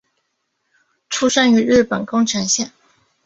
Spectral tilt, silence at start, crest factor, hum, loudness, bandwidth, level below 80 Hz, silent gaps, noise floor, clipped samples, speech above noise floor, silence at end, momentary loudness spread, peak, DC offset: -3 dB/octave; 1.1 s; 18 dB; none; -16 LUFS; 8 kHz; -52 dBFS; none; -71 dBFS; under 0.1%; 56 dB; 0.6 s; 8 LU; 0 dBFS; under 0.1%